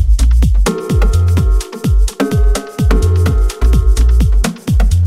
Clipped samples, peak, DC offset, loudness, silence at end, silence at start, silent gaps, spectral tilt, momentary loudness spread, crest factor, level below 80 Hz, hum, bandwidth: under 0.1%; 0 dBFS; under 0.1%; -14 LUFS; 0 s; 0 s; none; -6.5 dB/octave; 4 LU; 10 dB; -12 dBFS; none; 13.5 kHz